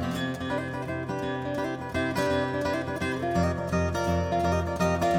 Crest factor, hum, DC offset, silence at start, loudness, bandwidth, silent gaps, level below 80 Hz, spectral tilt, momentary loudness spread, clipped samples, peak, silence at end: 16 dB; none; under 0.1%; 0 s; -28 LUFS; 17 kHz; none; -44 dBFS; -6 dB/octave; 5 LU; under 0.1%; -12 dBFS; 0 s